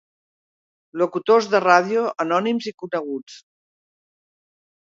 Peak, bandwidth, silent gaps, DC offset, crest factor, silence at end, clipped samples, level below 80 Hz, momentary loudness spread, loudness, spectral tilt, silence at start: 0 dBFS; 7.6 kHz; 2.74-2.78 s; under 0.1%; 22 dB; 1.5 s; under 0.1%; -76 dBFS; 13 LU; -20 LUFS; -5 dB/octave; 0.95 s